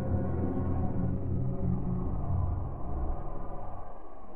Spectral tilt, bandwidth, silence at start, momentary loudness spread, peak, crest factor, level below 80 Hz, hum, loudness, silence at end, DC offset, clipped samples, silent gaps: -13 dB/octave; 2.6 kHz; 0 s; 11 LU; -16 dBFS; 14 dB; -38 dBFS; none; -34 LUFS; 0 s; 2%; under 0.1%; none